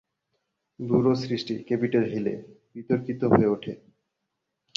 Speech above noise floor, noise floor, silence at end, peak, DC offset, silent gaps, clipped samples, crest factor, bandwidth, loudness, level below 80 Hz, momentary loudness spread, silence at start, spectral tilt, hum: 57 dB; -81 dBFS; 1 s; -4 dBFS; under 0.1%; none; under 0.1%; 24 dB; 7.4 kHz; -25 LUFS; -58 dBFS; 18 LU; 0.8 s; -8 dB/octave; none